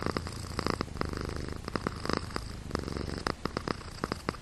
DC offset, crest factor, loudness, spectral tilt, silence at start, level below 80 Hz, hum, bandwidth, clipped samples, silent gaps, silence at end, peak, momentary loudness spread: under 0.1%; 26 dB; -36 LUFS; -5 dB/octave; 0 s; -44 dBFS; none; 13.5 kHz; under 0.1%; none; 0 s; -10 dBFS; 4 LU